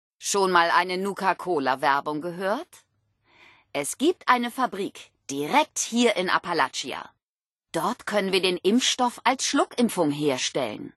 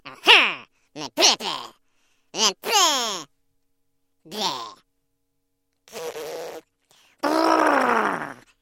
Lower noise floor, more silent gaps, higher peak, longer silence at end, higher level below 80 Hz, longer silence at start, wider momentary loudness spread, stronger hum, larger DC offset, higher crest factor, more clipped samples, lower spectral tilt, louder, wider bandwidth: first, under -90 dBFS vs -73 dBFS; first, 7.23-7.39 s, 7.46-7.53 s vs none; second, -4 dBFS vs 0 dBFS; second, 0.05 s vs 0.25 s; about the same, -72 dBFS vs -70 dBFS; first, 0.2 s vs 0.05 s; second, 10 LU vs 22 LU; neither; neither; about the same, 22 dB vs 24 dB; neither; first, -3 dB/octave vs -0.5 dB/octave; second, -24 LUFS vs -19 LUFS; second, 12.5 kHz vs 16.5 kHz